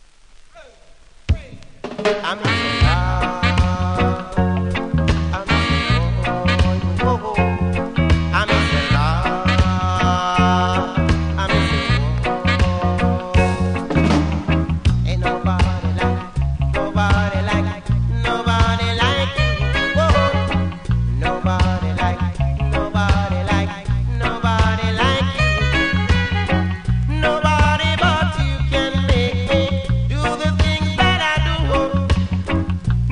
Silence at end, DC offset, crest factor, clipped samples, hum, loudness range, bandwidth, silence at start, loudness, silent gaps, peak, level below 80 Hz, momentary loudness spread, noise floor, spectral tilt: 0 s; under 0.1%; 16 dB; under 0.1%; none; 2 LU; 10.5 kHz; 0.55 s; -18 LUFS; none; -2 dBFS; -24 dBFS; 5 LU; -44 dBFS; -6 dB/octave